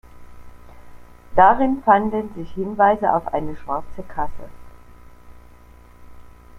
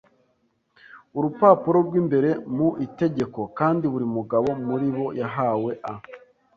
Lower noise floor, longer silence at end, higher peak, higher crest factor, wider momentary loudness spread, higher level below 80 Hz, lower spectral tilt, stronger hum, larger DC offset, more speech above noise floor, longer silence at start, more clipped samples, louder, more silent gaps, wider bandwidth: second, -45 dBFS vs -69 dBFS; second, 0 s vs 0.4 s; about the same, -2 dBFS vs -4 dBFS; about the same, 20 dB vs 20 dB; first, 15 LU vs 11 LU; first, -42 dBFS vs -62 dBFS; second, -8 dB/octave vs -9.5 dB/octave; first, 60 Hz at -55 dBFS vs none; neither; second, 27 dB vs 46 dB; second, 0.15 s vs 0.95 s; neither; first, -19 LUFS vs -23 LUFS; neither; first, 10 kHz vs 7 kHz